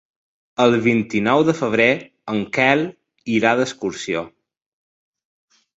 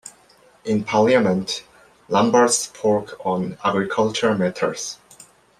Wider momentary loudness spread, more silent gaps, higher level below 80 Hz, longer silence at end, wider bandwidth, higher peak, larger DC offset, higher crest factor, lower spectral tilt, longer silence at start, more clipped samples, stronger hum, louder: second, 10 LU vs 13 LU; neither; about the same, -60 dBFS vs -60 dBFS; first, 1.5 s vs 0.35 s; second, 8 kHz vs 14.5 kHz; about the same, -2 dBFS vs -2 dBFS; neither; about the same, 20 dB vs 18 dB; first, -5.5 dB/octave vs -4 dB/octave; first, 0.6 s vs 0.05 s; neither; neither; about the same, -19 LUFS vs -20 LUFS